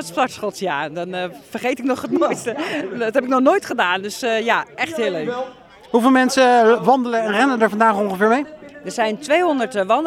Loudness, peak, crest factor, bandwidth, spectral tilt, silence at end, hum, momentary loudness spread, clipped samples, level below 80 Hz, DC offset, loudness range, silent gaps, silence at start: -18 LUFS; -2 dBFS; 18 dB; 15.5 kHz; -4 dB/octave; 0 s; none; 12 LU; under 0.1%; -64 dBFS; under 0.1%; 5 LU; none; 0 s